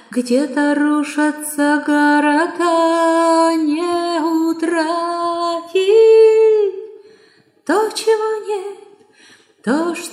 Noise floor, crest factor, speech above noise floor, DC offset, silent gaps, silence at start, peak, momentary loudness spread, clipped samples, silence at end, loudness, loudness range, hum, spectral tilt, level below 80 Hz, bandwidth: -52 dBFS; 12 dB; 36 dB; under 0.1%; none; 0.1 s; -2 dBFS; 10 LU; under 0.1%; 0 s; -15 LUFS; 5 LU; none; -3.5 dB/octave; -82 dBFS; 15 kHz